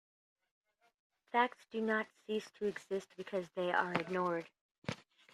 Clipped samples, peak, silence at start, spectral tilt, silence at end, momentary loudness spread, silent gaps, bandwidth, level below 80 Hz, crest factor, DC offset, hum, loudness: under 0.1%; -16 dBFS; 1.35 s; -5.5 dB/octave; 0.4 s; 12 LU; 4.61-4.82 s; 13 kHz; -80 dBFS; 24 dB; under 0.1%; none; -38 LUFS